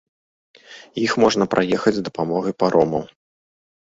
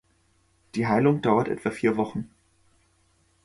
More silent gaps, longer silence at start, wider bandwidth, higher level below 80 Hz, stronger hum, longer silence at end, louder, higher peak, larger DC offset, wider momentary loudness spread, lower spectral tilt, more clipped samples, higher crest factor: neither; about the same, 0.7 s vs 0.75 s; second, 7.8 kHz vs 11.5 kHz; first, -54 dBFS vs -60 dBFS; neither; second, 0.9 s vs 1.2 s; first, -20 LUFS vs -25 LUFS; first, -2 dBFS vs -6 dBFS; neither; second, 9 LU vs 14 LU; second, -5.5 dB/octave vs -7.5 dB/octave; neither; about the same, 20 dB vs 20 dB